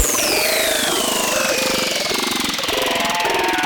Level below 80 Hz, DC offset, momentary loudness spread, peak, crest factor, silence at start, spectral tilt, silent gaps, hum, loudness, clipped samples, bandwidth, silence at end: -44 dBFS; under 0.1%; 3 LU; -4 dBFS; 16 dB; 0 s; -1 dB/octave; none; none; -17 LUFS; under 0.1%; 19.5 kHz; 0 s